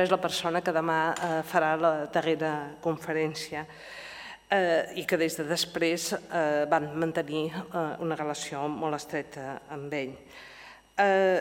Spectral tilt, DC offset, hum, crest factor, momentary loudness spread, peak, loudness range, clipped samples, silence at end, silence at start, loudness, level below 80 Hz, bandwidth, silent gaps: -4.5 dB/octave; under 0.1%; none; 20 dB; 14 LU; -8 dBFS; 5 LU; under 0.1%; 0 s; 0 s; -29 LUFS; -68 dBFS; 17 kHz; none